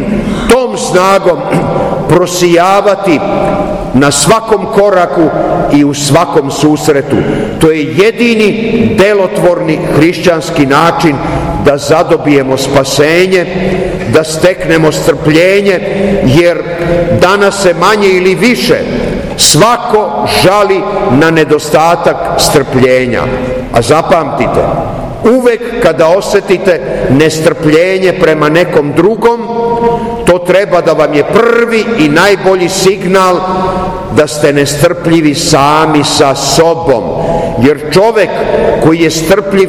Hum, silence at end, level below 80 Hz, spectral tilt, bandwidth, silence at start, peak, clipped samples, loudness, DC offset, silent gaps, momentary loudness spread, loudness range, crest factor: none; 0 s; -30 dBFS; -4.5 dB/octave; over 20 kHz; 0 s; 0 dBFS; 6%; -8 LUFS; under 0.1%; none; 5 LU; 1 LU; 8 dB